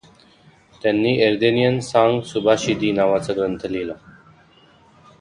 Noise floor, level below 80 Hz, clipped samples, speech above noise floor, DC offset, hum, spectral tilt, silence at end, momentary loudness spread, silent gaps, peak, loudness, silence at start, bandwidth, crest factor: -52 dBFS; -54 dBFS; under 0.1%; 34 dB; under 0.1%; none; -5.5 dB/octave; 1.25 s; 9 LU; none; -2 dBFS; -19 LUFS; 0.85 s; 10.5 kHz; 18 dB